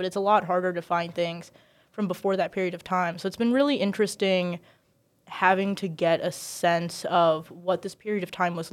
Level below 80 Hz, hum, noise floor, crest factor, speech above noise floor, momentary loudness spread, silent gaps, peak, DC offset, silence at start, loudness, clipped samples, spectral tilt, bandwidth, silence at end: -72 dBFS; none; -67 dBFS; 20 dB; 41 dB; 9 LU; none; -6 dBFS; under 0.1%; 0 s; -26 LUFS; under 0.1%; -5 dB/octave; 16 kHz; 0.05 s